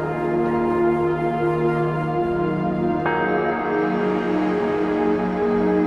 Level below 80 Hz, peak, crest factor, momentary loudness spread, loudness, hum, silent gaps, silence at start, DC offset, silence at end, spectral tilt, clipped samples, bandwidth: -48 dBFS; -8 dBFS; 12 dB; 2 LU; -21 LUFS; none; none; 0 s; under 0.1%; 0 s; -8.5 dB/octave; under 0.1%; 6.8 kHz